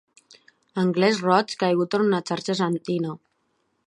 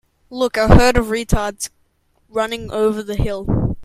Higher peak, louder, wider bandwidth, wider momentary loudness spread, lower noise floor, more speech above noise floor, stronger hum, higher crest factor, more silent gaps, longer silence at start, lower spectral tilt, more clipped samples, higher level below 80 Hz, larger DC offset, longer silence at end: second, -4 dBFS vs 0 dBFS; second, -23 LUFS vs -18 LUFS; second, 11.5 kHz vs 15.5 kHz; second, 9 LU vs 14 LU; first, -71 dBFS vs -61 dBFS; first, 49 dB vs 45 dB; neither; about the same, 20 dB vs 18 dB; neither; first, 0.75 s vs 0.3 s; about the same, -6 dB/octave vs -5.5 dB/octave; second, under 0.1% vs 0.1%; second, -72 dBFS vs -26 dBFS; neither; first, 0.7 s vs 0 s